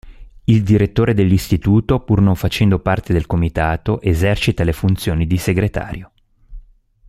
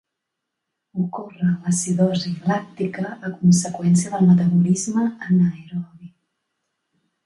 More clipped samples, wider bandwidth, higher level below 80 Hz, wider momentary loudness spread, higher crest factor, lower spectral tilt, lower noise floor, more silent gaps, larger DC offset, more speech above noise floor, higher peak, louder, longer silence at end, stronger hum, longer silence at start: neither; first, 15 kHz vs 11.5 kHz; first, -32 dBFS vs -62 dBFS; second, 5 LU vs 12 LU; about the same, 14 dB vs 16 dB; about the same, -7 dB/octave vs -6.5 dB/octave; second, -44 dBFS vs -81 dBFS; neither; neither; second, 29 dB vs 62 dB; first, -2 dBFS vs -6 dBFS; first, -16 LUFS vs -20 LUFS; second, 0.5 s vs 1.2 s; neither; second, 0.05 s vs 0.95 s